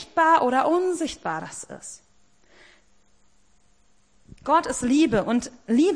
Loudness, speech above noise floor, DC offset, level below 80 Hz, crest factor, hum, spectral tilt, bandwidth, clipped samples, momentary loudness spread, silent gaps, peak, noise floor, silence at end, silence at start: -22 LUFS; 42 dB; 0.1%; -54 dBFS; 18 dB; none; -4.5 dB/octave; 10.5 kHz; under 0.1%; 18 LU; none; -8 dBFS; -64 dBFS; 0 s; 0 s